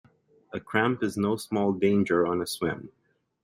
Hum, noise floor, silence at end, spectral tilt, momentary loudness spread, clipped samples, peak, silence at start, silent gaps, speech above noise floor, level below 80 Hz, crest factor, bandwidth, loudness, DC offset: none; -54 dBFS; 0.55 s; -6 dB/octave; 12 LU; under 0.1%; -8 dBFS; 0.55 s; none; 28 dB; -64 dBFS; 20 dB; 16 kHz; -26 LUFS; under 0.1%